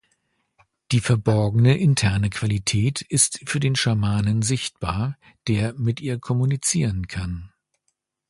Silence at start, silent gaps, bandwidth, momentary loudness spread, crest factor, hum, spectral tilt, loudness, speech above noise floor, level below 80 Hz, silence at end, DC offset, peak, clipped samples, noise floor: 0.9 s; none; 11.5 kHz; 10 LU; 18 dB; none; -4.5 dB/octave; -22 LUFS; 54 dB; -42 dBFS; 0.85 s; under 0.1%; -4 dBFS; under 0.1%; -75 dBFS